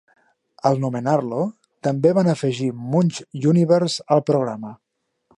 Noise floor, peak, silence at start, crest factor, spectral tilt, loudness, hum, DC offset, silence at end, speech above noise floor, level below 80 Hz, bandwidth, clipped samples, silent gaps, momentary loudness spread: -63 dBFS; -2 dBFS; 0.65 s; 18 dB; -7 dB/octave; -20 LUFS; none; under 0.1%; 0.65 s; 44 dB; -66 dBFS; 11 kHz; under 0.1%; none; 10 LU